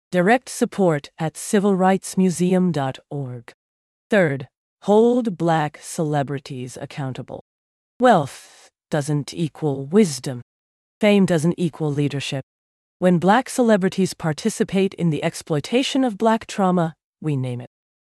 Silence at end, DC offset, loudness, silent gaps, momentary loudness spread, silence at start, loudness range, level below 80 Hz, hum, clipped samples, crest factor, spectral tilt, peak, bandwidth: 0.55 s; under 0.1%; -21 LUFS; 3.54-4.10 s, 4.57-4.77 s, 7.41-8.00 s, 10.42-11.01 s, 12.43-13.00 s, 17.04-17.13 s; 14 LU; 0.1 s; 3 LU; -62 dBFS; none; under 0.1%; 16 dB; -6 dB/octave; -4 dBFS; 13 kHz